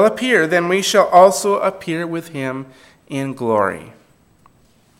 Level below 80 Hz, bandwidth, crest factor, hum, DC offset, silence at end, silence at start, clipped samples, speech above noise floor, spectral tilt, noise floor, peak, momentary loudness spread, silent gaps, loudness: -62 dBFS; 16.5 kHz; 18 dB; none; under 0.1%; 1.1 s; 0 s; under 0.1%; 38 dB; -4 dB/octave; -54 dBFS; 0 dBFS; 15 LU; none; -16 LUFS